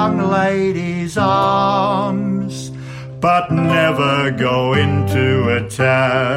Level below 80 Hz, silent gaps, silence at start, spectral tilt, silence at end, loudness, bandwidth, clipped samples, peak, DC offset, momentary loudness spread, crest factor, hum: -48 dBFS; none; 0 s; -6.5 dB/octave; 0 s; -16 LUFS; 15 kHz; under 0.1%; -2 dBFS; under 0.1%; 7 LU; 12 dB; none